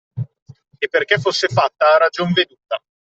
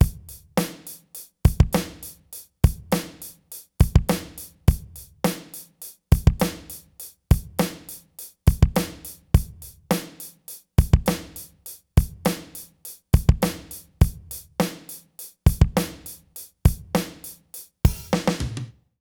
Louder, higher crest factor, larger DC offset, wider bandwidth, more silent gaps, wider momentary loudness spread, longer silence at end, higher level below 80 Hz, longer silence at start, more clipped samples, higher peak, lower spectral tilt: first, -17 LUFS vs -24 LUFS; second, 16 dB vs 22 dB; neither; second, 8.2 kHz vs 20 kHz; first, 0.42-0.46 s vs none; second, 15 LU vs 19 LU; about the same, 0.35 s vs 0.35 s; second, -60 dBFS vs -28 dBFS; first, 0.15 s vs 0 s; neither; about the same, -2 dBFS vs -2 dBFS; second, -4.5 dB/octave vs -6 dB/octave